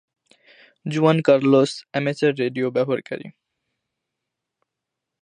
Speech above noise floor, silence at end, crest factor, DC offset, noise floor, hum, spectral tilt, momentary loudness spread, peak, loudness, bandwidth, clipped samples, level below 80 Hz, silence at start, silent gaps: 64 dB; 1.9 s; 20 dB; under 0.1%; -83 dBFS; none; -6.5 dB/octave; 14 LU; -2 dBFS; -20 LUFS; 10 kHz; under 0.1%; -72 dBFS; 0.85 s; none